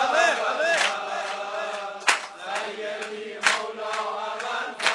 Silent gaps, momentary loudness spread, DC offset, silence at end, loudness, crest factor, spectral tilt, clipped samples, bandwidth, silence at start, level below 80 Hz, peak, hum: none; 10 LU; under 0.1%; 0 s; -26 LUFS; 26 dB; 0 dB/octave; under 0.1%; 15 kHz; 0 s; -82 dBFS; 0 dBFS; none